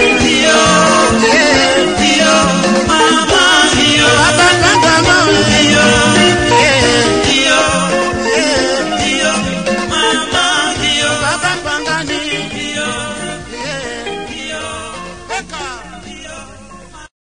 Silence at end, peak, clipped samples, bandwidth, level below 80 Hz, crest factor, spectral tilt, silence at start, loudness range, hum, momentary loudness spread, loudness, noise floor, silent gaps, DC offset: 0.35 s; 0 dBFS; under 0.1%; 10.5 kHz; -34 dBFS; 12 dB; -3 dB/octave; 0 s; 14 LU; none; 15 LU; -10 LUFS; -34 dBFS; none; 0.7%